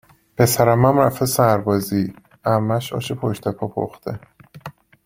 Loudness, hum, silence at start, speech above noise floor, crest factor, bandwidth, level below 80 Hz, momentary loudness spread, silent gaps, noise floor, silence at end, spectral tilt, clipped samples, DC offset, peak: -19 LUFS; none; 0.4 s; 21 dB; 18 dB; 16.5 kHz; -52 dBFS; 22 LU; none; -39 dBFS; 0.35 s; -6 dB/octave; under 0.1%; under 0.1%; -2 dBFS